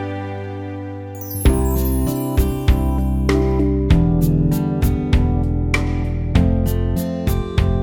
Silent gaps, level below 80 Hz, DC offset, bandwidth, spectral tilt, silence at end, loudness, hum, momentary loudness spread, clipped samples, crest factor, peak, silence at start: none; -22 dBFS; under 0.1%; over 20 kHz; -7 dB/octave; 0 s; -19 LUFS; none; 11 LU; under 0.1%; 16 dB; -2 dBFS; 0 s